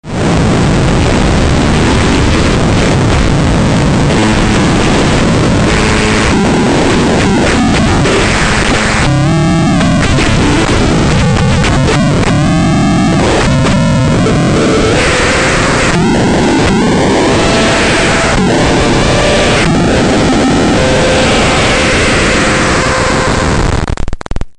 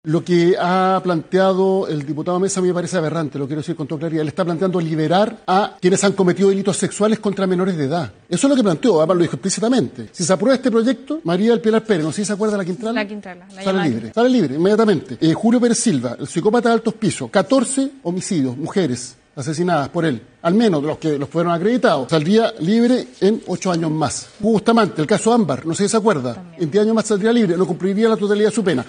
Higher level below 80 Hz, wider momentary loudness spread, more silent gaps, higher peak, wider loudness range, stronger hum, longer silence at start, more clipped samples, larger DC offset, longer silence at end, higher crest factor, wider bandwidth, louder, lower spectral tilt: first, -18 dBFS vs -60 dBFS; second, 1 LU vs 7 LU; neither; about the same, 0 dBFS vs -2 dBFS; about the same, 1 LU vs 3 LU; neither; about the same, 0.05 s vs 0.05 s; neither; first, 0.2% vs under 0.1%; about the same, 0.05 s vs 0 s; second, 8 dB vs 16 dB; about the same, 11 kHz vs 10 kHz; first, -9 LUFS vs -18 LUFS; about the same, -5 dB/octave vs -5.5 dB/octave